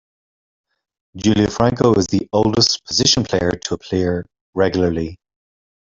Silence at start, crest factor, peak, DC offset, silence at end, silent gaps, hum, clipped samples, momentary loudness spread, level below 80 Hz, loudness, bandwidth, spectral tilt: 1.15 s; 18 dB; 0 dBFS; under 0.1%; 0.75 s; 4.41-4.53 s; none; under 0.1%; 10 LU; -44 dBFS; -17 LUFS; 8 kHz; -4.5 dB/octave